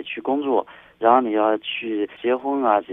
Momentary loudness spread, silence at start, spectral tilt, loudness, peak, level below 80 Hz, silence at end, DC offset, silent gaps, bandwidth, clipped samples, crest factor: 7 LU; 0 s; -7.5 dB/octave; -21 LUFS; -2 dBFS; -68 dBFS; 0 s; under 0.1%; none; 3.9 kHz; under 0.1%; 20 dB